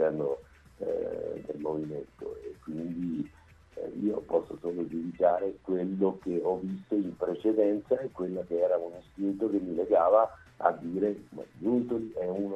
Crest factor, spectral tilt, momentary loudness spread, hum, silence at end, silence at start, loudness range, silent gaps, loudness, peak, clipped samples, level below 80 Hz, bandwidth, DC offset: 22 dB; -9.5 dB/octave; 13 LU; none; 0 s; 0 s; 8 LU; none; -31 LUFS; -8 dBFS; under 0.1%; -62 dBFS; 8.2 kHz; under 0.1%